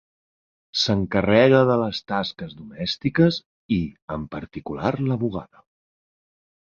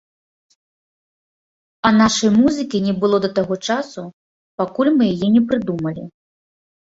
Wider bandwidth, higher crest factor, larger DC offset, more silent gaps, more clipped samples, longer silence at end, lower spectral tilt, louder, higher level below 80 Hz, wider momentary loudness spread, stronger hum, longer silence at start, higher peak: about the same, 7.6 kHz vs 8 kHz; about the same, 22 dB vs 18 dB; neither; second, 3.46-3.69 s, 4.02-4.08 s vs 4.13-4.58 s; neither; first, 1.2 s vs 0.8 s; first, -6.5 dB/octave vs -5 dB/octave; second, -22 LUFS vs -17 LUFS; first, -48 dBFS vs -54 dBFS; about the same, 17 LU vs 18 LU; neither; second, 0.75 s vs 1.85 s; about the same, -2 dBFS vs -2 dBFS